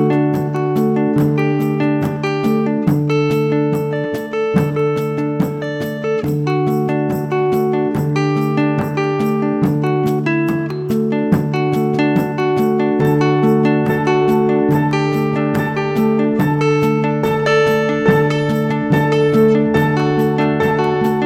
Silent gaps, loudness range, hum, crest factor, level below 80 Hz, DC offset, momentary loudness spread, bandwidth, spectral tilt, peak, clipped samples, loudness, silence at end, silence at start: none; 3 LU; none; 14 dB; -48 dBFS; under 0.1%; 5 LU; 15 kHz; -8 dB/octave; 0 dBFS; under 0.1%; -16 LUFS; 0 s; 0 s